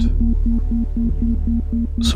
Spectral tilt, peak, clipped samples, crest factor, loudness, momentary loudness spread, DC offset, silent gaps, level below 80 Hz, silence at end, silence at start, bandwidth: -6.5 dB/octave; -4 dBFS; under 0.1%; 12 dB; -21 LUFS; 3 LU; under 0.1%; none; -18 dBFS; 0 s; 0 s; 9.8 kHz